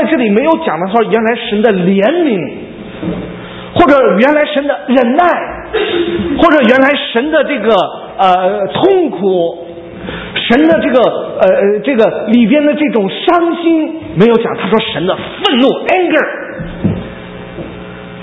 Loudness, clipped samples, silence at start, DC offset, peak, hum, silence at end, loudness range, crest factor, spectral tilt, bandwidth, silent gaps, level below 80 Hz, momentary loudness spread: -11 LUFS; 0.3%; 0 s; under 0.1%; 0 dBFS; none; 0 s; 3 LU; 12 dB; -7.5 dB/octave; 8 kHz; none; -40 dBFS; 15 LU